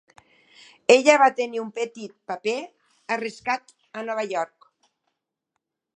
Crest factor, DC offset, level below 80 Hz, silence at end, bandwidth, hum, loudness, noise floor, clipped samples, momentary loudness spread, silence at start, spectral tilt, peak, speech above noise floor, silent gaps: 24 dB; under 0.1%; -78 dBFS; 1.5 s; 9.6 kHz; none; -23 LUFS; -81 dBFS; under 0.1%; 18 LU; 0.9 s; -2.5 dB/octave; -2 dBFS; 59 dB; none